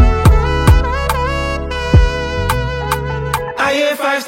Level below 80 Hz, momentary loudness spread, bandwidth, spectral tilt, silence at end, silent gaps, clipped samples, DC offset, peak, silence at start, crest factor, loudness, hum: -18 dBFS; 7 LU; 16.5 kHz; -5.5 dB/octave; 0 s; none; under 0.1%; under 0.1%; 0 dBFS; 0 s; 14 dB; -15 LUFS; none